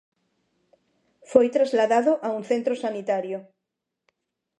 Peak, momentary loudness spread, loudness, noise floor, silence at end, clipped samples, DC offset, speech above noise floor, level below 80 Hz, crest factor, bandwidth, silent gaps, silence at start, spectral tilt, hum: -2 dBFS; 8 LU; -23 LUFS; -83 dBFS; 1.15 s; under 0.1%; under 0.1%; 61 dB; -72 dBFS; 22 dB; 10.5 kHz; none; 1.3 s; -5 dB/octave; none